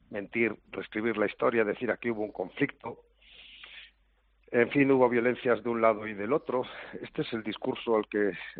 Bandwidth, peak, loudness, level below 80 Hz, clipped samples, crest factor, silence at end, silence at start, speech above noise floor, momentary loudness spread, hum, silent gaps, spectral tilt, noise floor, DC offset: 4.7 kHz; -10 dBFS; -29 LUFS; -66 dBFS; under 0.1%; 20 dB; 0 s; 0.1 s; 39 dB; 18 LU; none; none; -4.5 dB/octave; -68 dBFS; under 0.1%